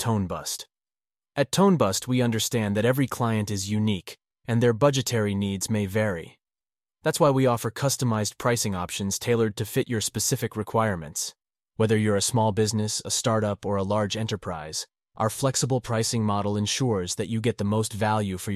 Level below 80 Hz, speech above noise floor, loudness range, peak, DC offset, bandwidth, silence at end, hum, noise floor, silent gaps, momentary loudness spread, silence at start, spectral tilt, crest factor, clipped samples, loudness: -56 dBFS; over 65 dB; 2 LU; -8 dBFS; under 0.1%; 15.5 kHz; 0 s; none; under -90 dBFS; none; 9 LU; 0 s; -5 dB/octave; 18 dB; under 0.1%; -25 LUFS